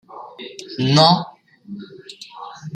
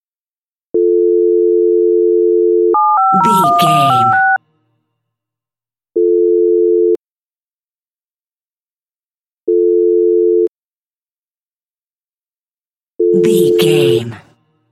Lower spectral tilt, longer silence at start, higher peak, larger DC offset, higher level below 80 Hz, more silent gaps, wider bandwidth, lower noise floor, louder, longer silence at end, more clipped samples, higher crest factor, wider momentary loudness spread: about the same, -5.5 dB/octave vs -6 dB/octave; second, 0.15 s vs 0.75 s; about the same, 0 dBFS vs 0 dBFS; neither; first, -60 dBFS vs -66 dBFS; second, none vs 6.99-7.31 s, 7.37-7.94 s, 8.04-8.20 s, 8.26-8.86 s, 8.96-9.47 s, 10.48-11.68 s, 11.78-12.19 s, 12.28-12.99 s; second, 9.8 kHz vs 14 kHz; second, -40 dBFS vs under -90 dBFS; second, -15 LUFS vs -12 LUFS; second, 0 s vs 0.55 s; neither; first, 22 dB vs 14 dB; first, 24 LU vs 7 LU